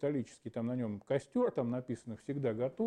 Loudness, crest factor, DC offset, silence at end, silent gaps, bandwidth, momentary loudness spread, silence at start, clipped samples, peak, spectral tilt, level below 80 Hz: -37 LUFS; 16 dB; under 0.1%; 0 s; none; 10 kHz; 9 LU; 0 s; under 0.1%; -20 dBFS; -8 dB/octave; -74 dBFS